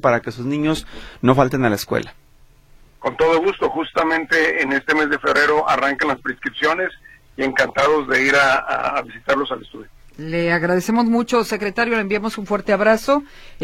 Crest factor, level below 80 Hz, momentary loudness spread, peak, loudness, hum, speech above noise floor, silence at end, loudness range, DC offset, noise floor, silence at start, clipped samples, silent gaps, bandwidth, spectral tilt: 18 dB; -46 dBFS; 9 LU; 0 dBFS; -18 LUFS; none; 31 dB; 0 s; 3 LU; under 0.1%; -49 dBFS; 0.05 s; under 0.1%; none; 16.5 kHz; -5 dB/octave